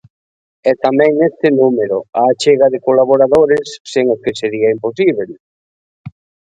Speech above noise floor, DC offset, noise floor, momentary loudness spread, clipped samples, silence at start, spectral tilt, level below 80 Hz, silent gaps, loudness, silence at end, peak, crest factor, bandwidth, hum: over 78 dB; under 0.1%; under -90 dBFS; 7 LU; under 0.1%; 0.65 s; -5.5 dB/octave; -54 dBFS; 3.80-3.85 s, 5.40-6.04 s; -13 LUFS; 0.4 s; 0 dBFS; 14 dB; 9.2 kHz; none